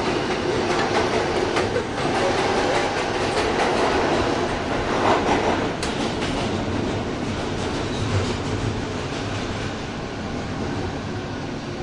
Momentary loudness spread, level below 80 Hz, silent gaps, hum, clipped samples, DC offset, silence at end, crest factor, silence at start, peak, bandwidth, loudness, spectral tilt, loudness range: 8 LU; -40 dBFS; none; none; under 0.1%; under 0.1%; 0 s; 18 dB; 0 s; -6 dBFS; 11.5 kHz; -23 LUFS; -5 dB/octave; 5 LU